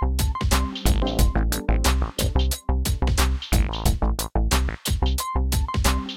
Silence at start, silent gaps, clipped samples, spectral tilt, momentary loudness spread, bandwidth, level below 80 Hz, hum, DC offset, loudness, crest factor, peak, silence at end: 0 s; none; under 0.1%; -4.5 dB/octave; 3 LU; 16.5 kHz; -24 dBFS; none; under 0.1%; -24 LUFS; 16 dB; -6 dBFS; 0 s